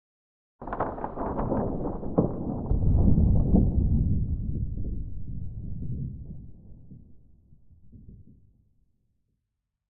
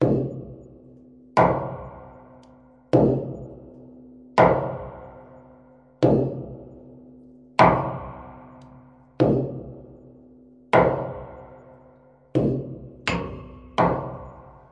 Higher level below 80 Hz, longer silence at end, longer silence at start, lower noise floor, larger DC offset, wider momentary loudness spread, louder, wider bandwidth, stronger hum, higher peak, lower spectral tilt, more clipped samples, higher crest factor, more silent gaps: first, -32 dBFS vs -48 dBFS; first, 1.65 s vs 0.3 s; first, 0.6 s vs 0 s; first, -83 dBFS vs -53 dBFS; neither; second, 16 LU vs 25 LU; second, -28 LUFS vs -23 LUFS; second, 2.4 kHz vs 10 kHz; neither; second, -8 dBFS vs -2 dBFS; first, -13 dB/octave vs -8 dB/octave; neither; about the same, 20 dB vs 24 dB; neither